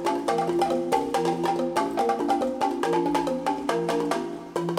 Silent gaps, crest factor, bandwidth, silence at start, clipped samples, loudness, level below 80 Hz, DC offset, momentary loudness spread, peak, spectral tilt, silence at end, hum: none; 16 dB; 16 kHz; 0 s; under 0.1%; -26 LUFS; -58 dBFS; under 0.1%; 3 LU; -10 dBFS; -5 dB/octave; 0 s; none